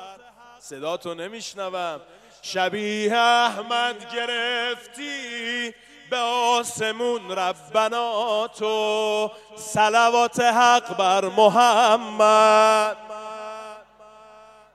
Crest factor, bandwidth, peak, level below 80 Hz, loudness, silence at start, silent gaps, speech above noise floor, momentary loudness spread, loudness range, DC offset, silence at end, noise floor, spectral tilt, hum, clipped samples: 20 dB; 14 kHz; -4 dBFS; -70 dBFS; -21 LUFS; 0 s; none; 27 dB; 17 LU; 7 LU; under 0.1%; 0.95 s; -48 dBFS; -2.5 dB/octave; none; under 0.1%